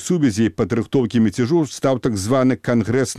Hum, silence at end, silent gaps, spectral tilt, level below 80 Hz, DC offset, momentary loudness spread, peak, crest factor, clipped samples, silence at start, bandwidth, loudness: none; 0 s; none; -6 dB/octave; -50 dBFS; 0.2%; 3 LU; -6 dBFS; 12 dB; under 0.1%; 0 s; 14 kHz; -19 LUFS